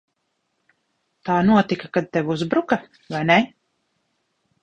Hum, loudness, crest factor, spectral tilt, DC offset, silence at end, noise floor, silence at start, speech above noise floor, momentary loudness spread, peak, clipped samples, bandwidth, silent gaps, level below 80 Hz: none; -21 LUFS; 20 dB; -7 dB/octave; under 0.1%; 1.15 s; -73 dBFS; 1.25 s; 53 dB; 11 LU; -2 dBFS; under 0.1%; 8.2 kHz; none; -58 dBFS